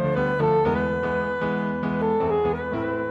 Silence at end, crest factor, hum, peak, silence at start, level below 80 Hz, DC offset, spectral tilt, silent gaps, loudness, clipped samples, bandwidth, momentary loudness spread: 0 s; 12 dB; none; -10 dBFS; 0 s; -46 dBFS; under 0.1%; -9 dB/octave; none; -24 LUFS; under 0.1%; 7.4 kHz; 5 LU